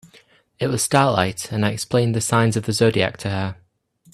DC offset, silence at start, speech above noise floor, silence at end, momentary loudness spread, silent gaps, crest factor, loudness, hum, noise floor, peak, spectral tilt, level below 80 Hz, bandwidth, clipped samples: under 0.1%; 0.6 s; 37 dB; 0.6 s; 8 LU; none; 20 dB; -20 LUFS; none; -57 dBFS; 0 dBFS; -5 dB/octave; -54 dBFS; 13.5 kHz; under 0.1%